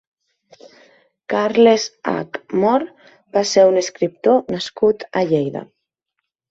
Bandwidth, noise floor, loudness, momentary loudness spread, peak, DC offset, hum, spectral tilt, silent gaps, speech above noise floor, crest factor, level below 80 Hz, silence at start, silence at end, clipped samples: 8 kHz; -78 dBFS; -18 LUFS; 11 LU; -2 dBFS; under 0.1%; none; -4.5 dB/octave; none; 61 dB; 18 dB; -62 dBFS; 1.3 s; 0.85 s; under 0.1%